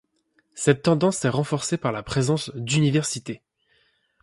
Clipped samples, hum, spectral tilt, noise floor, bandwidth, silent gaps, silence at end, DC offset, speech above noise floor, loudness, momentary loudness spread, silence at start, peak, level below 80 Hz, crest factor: under 0.1%; none; -5 dB/octave; -68 dBFS; 11.5 kHz; none; 0.85 s; under 0.1%; 45 dB; -23 LUFS; 8 LU; 0.55 s; -4 dBFS; -56 dBFS; 20 dB